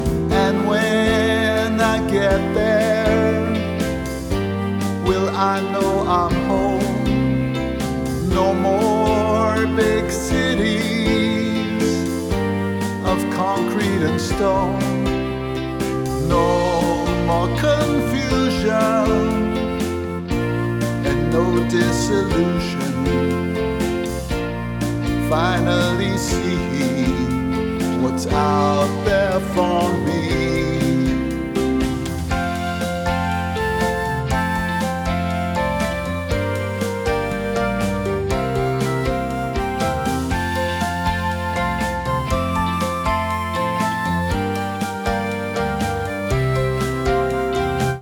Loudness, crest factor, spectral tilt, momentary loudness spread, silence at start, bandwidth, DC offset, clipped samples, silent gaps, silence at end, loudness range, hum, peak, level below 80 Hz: -20 LUFS; 16 dB; -6 dB/octave; 5 LU; 0 s; 19.5 kHz; under 0.1%; under 0.1%; none; 0 s; 3 LU; none; -4 dBFS; -32 dBFS